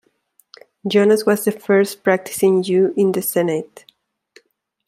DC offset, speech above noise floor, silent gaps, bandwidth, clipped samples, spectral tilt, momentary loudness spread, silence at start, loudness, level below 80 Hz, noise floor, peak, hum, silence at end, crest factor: under 0.1%; 43 dB; none; 16 kHz; under 0.1%; -5 dB/octave; 7 LU; 0.85 s; -17 LUFS; -68 dBFS; -60 dBFS; -2 dBFS; none; 1.2 s; 16 dB